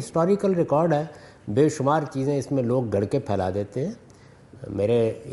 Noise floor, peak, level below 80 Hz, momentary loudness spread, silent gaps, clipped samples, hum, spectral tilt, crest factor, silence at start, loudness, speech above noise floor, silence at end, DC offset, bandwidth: -49 dBFS; -8 dBFS; -58 dBFS; 12 LU; none; under 0.1%; none; -7.5 dB/octave; 16 dB; 0 s; -24 LUFS; 26 dB; 0 s; under 0.1%; 11.5 kHz